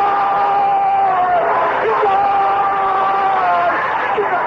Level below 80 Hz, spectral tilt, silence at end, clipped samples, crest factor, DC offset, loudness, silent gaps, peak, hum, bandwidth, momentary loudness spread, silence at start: -52 dBFS; -5.5 dB/octave; 0 s; under 0.1%; 10 dB; under 0.1%; -15 LUFS; none; -6 dBFS; none; 6.4 kHz; 2 LU; 0 s